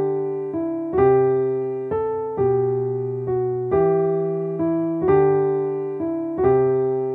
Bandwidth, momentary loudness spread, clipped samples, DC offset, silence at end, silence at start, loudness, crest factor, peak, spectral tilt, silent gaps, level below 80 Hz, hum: 2.9 kHz; 8 LU; under 0.1%; under 0.1%; 0 s; 0 s; -21 LUFS; 14 dB; -6 dBFS; -12 dB/octave; none; -50 dBFS; none